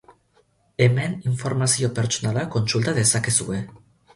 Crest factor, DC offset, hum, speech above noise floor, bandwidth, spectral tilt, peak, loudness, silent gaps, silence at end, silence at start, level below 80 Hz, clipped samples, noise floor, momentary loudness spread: 18 dB; under 0.1%; none; 41 dB; 11.5 kHz; -4 dB/octave; -4 dBFS; -22 LUFS; none; 0.4 s; 0.8 s; -54 dBFS; under 0.1%; -62 dBFS; 10 LU